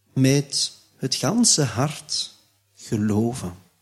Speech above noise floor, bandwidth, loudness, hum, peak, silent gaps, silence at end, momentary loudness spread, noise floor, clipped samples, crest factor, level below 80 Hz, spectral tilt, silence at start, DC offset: 30 dB; 15 kHz; -22 LUFS; none; -4 dBFS; none; 0.25 s; 15 LU; -52 dBFS; under 0.1%; 20 dB; -58 dBFS; -4 dB/octave; 0.15 s; under 0.1%